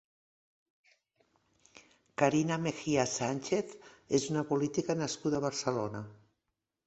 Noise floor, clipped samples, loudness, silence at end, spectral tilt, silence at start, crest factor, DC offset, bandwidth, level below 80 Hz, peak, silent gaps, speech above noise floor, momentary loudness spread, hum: -86 dBFS; under 0.1%; -32 LUFS; 0.7 s; -5 dB/octave; 1.75 s; 22 dB; under 0.1%; 8.2 kHz; -68 dBFS; -12 dBFS; none; 54 dB; 10 LU; none